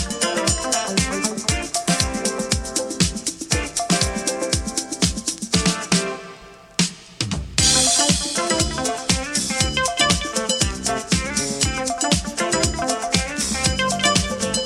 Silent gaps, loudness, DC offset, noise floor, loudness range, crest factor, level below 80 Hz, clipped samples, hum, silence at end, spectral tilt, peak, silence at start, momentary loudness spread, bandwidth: none; -20 LUFS; under 0.1%; -42 dBFS; 3 LU; 20 dB; -34 dBFS; under 0.1%; none; 0 s; -2.5 dB/octave; 0 dBFS; 0 s; 6 LU; 16.5 kHz